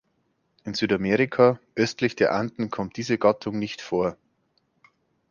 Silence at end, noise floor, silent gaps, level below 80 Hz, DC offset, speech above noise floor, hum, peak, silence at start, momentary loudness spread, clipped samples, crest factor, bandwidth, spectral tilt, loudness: 1.15 s; -71 dBFS; none; -60 dBFS; under 0.1%; 47 dB; none; -4 dBFS; 0.65 s; 10 LU; under 0.1%; 22 dB; 7.2 kHz; -6 dB/octave; -24 LUFS